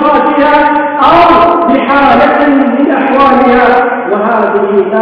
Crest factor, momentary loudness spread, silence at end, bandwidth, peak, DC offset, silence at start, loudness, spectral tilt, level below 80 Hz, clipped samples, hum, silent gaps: 6 dB; 4 LU; 0 s; 5.4 kHz; 0 dBFS; under 0.1%; 0 s; -7 LUFS; -7.5 dB/octave; -36 dBFS; 2%; none; none